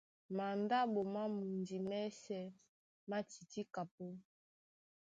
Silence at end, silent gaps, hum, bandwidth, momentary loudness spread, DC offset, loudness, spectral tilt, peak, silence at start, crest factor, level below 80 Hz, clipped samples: 0.9 s; 2.68-3.07 s, 3.91-3.98 s; none; 7.8 kHz; 15 LU; under 0.1%; -42 LUFS; -6 dB/octave; -24 dBFS; 0.3 s; 18 dB; -86 dBFS; under 0.1%